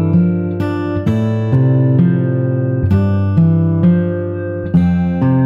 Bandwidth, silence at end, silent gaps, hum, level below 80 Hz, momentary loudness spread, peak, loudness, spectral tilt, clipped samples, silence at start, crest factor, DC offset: 5.4 kHz; 0 s; none; none; -38 dBFS; 6 LU; -2 dBFS; -14 LUFS; -11 dB/octave; under 0.1%; 0 s; 12 dB; under 0.1%